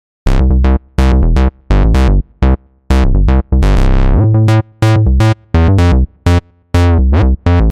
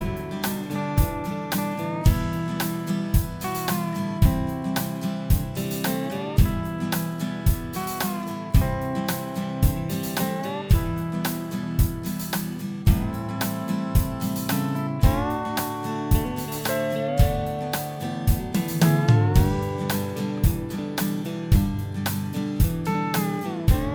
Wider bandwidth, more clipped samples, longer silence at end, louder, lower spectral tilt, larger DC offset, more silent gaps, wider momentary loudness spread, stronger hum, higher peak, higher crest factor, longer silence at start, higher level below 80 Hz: second, 10 kHz vs over 20 kHz; neither; about the same, 0 s vs 0 s; first, -12 LUFS vs -25 LUFS; first, -8 dB/octave vs -6 dB/octave; neither; neither; about the same, 4 LU vs 6 LU; neither; first, 0 dBFS vs -4 dBFS; second, 8 dB vs 18 dB; first, 0.25 s vs 0 s; first, -12 dBFS vs -30 dBFS